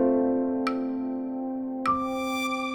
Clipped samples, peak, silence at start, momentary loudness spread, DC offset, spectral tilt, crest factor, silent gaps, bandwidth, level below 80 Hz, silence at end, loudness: under 0.1%; -12 dBFS; 0 s; 7 LU; under 0.1%; -4.5 dB/octave; 14 dB; none; 19.5 kHz; -60 dBFS; 0 s; -28 LUFS